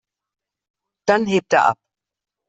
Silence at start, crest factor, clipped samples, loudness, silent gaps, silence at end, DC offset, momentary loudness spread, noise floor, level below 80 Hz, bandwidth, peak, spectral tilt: 1.05 s; 20 dB; under 0.1%; -18 LUFS; none; 0.75 s; under 0.1%; 9 LU; -87 dBFS; -64 dBFS; 8.2 kHz; -2 dBFS; -5 dB/octave